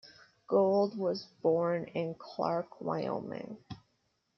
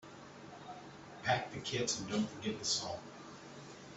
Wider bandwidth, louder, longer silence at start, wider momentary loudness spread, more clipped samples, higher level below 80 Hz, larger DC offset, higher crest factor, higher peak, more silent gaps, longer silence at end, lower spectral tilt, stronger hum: second, 6.4 kHz vs 8.2 kHz; first, -33 LUFS vs -37 LUFS; about the same, 0.05 s vs 0 s; about the same, 16 LU vs 17 LU; neither; about the same, -74 dBFS vs -70 dBFS; neither; about the same, 18 dB vs 22 dB; about the same, -16 dBFS vs -18 dBFS; neither; first, 0.6 s vs 0 s; first, -8 dB/octave vs -3 dB/octave; neither